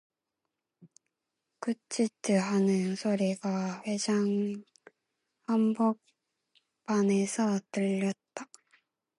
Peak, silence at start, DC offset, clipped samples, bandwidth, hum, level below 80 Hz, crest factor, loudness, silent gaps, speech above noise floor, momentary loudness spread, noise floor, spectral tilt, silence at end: -16 dBFS; 0.8 s; under 0.1%; under 0.1%; 11.5 kHz; none; -82 dBFS; 16 dB; -30 LUFS; none; 58 dB; 14 LU; -86 dBFS; -6 dB/octave; 0.75 s